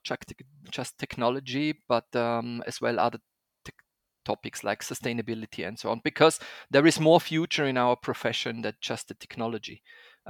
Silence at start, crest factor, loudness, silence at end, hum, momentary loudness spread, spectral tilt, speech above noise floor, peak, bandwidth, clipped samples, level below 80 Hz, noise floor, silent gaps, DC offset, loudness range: 0.05 s; 24 dB; -28 LUFS; 0 s; none; 15 LU; -4.5 dB/octave; 40 dB; -4 dBFS; 18.5 kHz; under 0.1%; -68 dBFS; -68 dBFS; none; under 0.1%; 8 LU